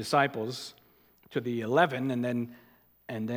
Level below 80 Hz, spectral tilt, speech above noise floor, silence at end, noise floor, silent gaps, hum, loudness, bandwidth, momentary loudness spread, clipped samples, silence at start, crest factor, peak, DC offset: -76 dBFS; -5.5 dB/octave; 33 dB; 0 s; -62 dBFS; none; none; -30 LUFS; 17.5 kHz; 15 LU; under 0.1%; 0 s; 22 dB; -10 dBFS; under 0.1%